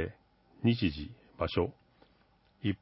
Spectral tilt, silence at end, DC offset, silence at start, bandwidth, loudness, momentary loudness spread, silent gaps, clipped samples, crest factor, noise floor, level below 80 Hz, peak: -10.5 dB/octave; 0.05 s; under 0.1%; 0 s; 5.8 kHz; -34 LUFS; 13 LU; none; under 0.1%; 20 dB; -67 dBFS; -50 dBFS; -14 dBFS